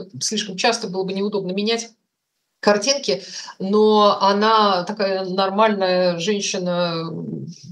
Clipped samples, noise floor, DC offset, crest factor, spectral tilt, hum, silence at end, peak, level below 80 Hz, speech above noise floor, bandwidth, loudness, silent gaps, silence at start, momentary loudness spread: under 0.1%; -76 dBFS; under 0.1%; 18 dB; -4 dB/octave; none; 0 s; -2 dBFS; -80 dBFS; 56 dB; 12 kHz; -19 LUFS; none; 0 s; 12 LU